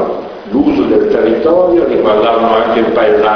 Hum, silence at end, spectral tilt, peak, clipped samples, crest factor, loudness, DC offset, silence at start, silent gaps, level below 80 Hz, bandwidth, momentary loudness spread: none; 0 s; -7.5 dB/octave; 0 dBFS; under 0.1%; 10 dB; -10 LUFS; under 0.1%; 0 s; none; -40 dBFS; 6.2 kHz; 4 LU